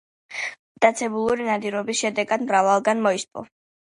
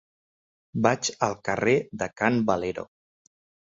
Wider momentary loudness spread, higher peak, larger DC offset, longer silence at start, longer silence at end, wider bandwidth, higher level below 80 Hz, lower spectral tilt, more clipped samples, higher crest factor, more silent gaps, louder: about the same, 12 LU vs 11 LU; about the same, -2 dBFS vs -4 dBFS; neither; second, 0.3 s vs 0.75 s; second, 0.55 s vs 0.95 s; first, 11.5 kHz vs 8 kHz; about the same, -64 dBFS vs -60 dBFS; about the same, -3.5 dB/octave vs -4.5 dB/octave; neither; about the same, 22 dB vs 22 dB; first, 0.59-0.75 s vs none; first, -22 LUFS vs -26 LUFS